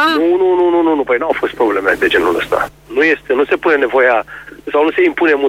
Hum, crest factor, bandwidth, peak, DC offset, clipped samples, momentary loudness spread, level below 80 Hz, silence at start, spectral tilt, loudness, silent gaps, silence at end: none; 12 dB; 15.5 kHz; -2 dBFS; under 0.1%; under 0.1%; 6 LU; -46 dBFS; 0 s; -4.5 dB/octave; -13 LUFS; none; 0 s